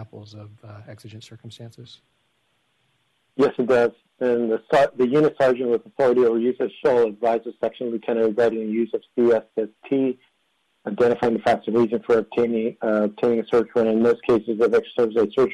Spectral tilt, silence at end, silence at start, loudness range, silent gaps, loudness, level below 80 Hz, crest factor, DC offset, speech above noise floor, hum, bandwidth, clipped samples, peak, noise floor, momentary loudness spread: -7 dB/octave; 0 s; 0 s; 5 LU; none; -21 LUFS; -62 dBFS; 12 dB; under 0.1%; 48 dB; none; 9.4 kHz; under 0.1%; -10 dBFS; -69 dBFS; 21 LU